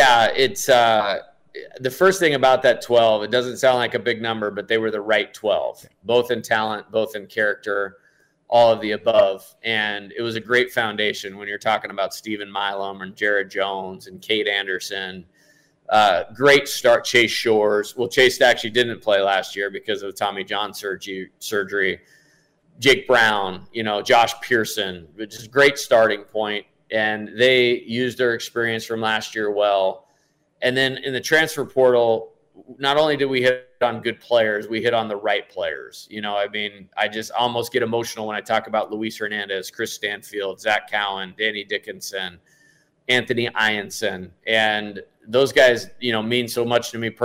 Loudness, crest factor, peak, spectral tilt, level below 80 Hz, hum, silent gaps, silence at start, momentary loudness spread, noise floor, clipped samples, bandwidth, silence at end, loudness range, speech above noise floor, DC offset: -20 LUFS; 16 dB; -6 dBFS; -3.5 dB/octave; -62 dBFS; none; none; 0 s; 12 LU; -64 dBFS; under 0.1%; 16 kHz; 0 s; 6 LU; 44 dB; under 0.1%